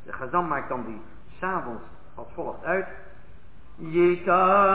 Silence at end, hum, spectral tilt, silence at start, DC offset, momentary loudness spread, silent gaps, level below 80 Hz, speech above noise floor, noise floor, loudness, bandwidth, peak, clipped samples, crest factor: 0 s; none; -10 dB/octave; 0.05 s; 1%; 22 LU; none; -52 dBFS; 25 dB; -50 dBFS; -25 LUFS; 4 kHz; -8 dBFS; under 0.1%; 18 dB